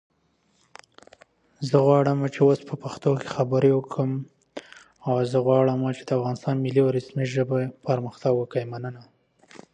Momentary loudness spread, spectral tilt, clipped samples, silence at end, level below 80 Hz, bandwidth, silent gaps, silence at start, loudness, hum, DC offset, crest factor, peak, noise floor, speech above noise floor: 14 LU; -8 dB/octave; under 0.1%; 0.15 s; -68 dBFS; 9.4 kHz; none; 1.6 s; -24 LUFS; none; under 0.1%; 18 dB; -6 dBFS; -67 dBFS; 44 dB